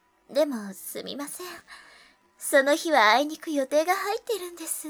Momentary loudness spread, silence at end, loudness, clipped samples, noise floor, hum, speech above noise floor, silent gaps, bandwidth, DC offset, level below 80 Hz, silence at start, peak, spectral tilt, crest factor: 16 LU; 0 s; -25 LUFS; under 0.1%; -56 dBFS; none; 31 dB; none; over 20 kHz; under 0.1%; -76 dBFS; 0.3 s; -6 dBFS; -2 dB/octave; 20 dB